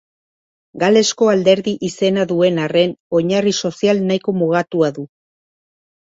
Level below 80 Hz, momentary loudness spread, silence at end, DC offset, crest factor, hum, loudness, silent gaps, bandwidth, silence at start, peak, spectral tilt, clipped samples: -60 dBFS; 6 LU; 1.1 s; under 0.1%; 16 dB; none; -16 LUFS; 3.00-3.10 s; 8 kHz; 0.75 s; 0 dBFS; -5 dB/octave; under 0.1%